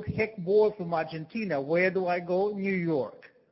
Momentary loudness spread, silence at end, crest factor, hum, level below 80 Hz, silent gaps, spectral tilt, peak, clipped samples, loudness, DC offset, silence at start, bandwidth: 7 LU; 0.25 s; 16 dB; none; -58 dBFS; none; -11 dB/octave; -12 dBFS; under 0.1%; -28 LUFS; under 0.1%; 0 s; 5.8 kHz